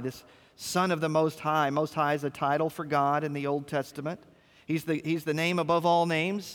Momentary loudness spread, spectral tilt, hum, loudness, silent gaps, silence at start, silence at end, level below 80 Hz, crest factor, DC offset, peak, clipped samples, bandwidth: 9 LU; -5.5 dB/octave; none; -28 LUFS; none; 0 s; 0 s; -70 dBFS; 16 dB; under 0.1%; -12 dBFS; under 0.1%; 19.5 kHz